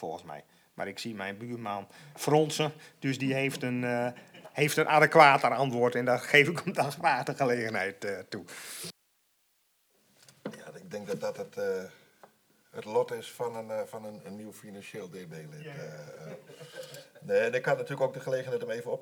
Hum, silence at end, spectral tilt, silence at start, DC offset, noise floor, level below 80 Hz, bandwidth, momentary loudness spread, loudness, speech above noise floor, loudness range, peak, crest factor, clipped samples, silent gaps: none; 0 s; -4.5 dB/octave; 0 s; under 0.1%; -72 dBFS; -82 dBFS; over 20 kHz; 22 LU; -29 LUFS; 42 dB; 17 LU; -6 dBFS; 26 dB; under 0.1%; none